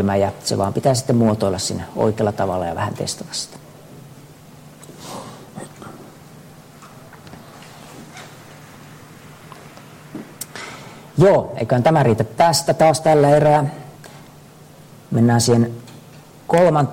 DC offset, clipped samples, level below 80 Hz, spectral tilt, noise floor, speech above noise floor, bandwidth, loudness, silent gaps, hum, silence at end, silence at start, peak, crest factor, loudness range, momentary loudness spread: under 0.1%; under 0.1%; -52 dBFS; -5.5 dB/octave; -43 dBFS; 27 dB; 16.5 kHz; -17 LUFS; none; none; 0 s; 0 s; -4 dBFS; 16 dB; 24 LU; 25 LU